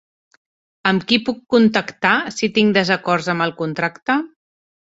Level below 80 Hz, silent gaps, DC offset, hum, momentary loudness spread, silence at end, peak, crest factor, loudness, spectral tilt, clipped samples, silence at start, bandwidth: -60 dBFS; 4.02-4.06 s; under 0.1%; none; 7 LU; 0.6 s; -2 dBFS; 18 dB; -18 LUFS; -5 dB/octave; under 0.1%; 0.85 s; 8 kHz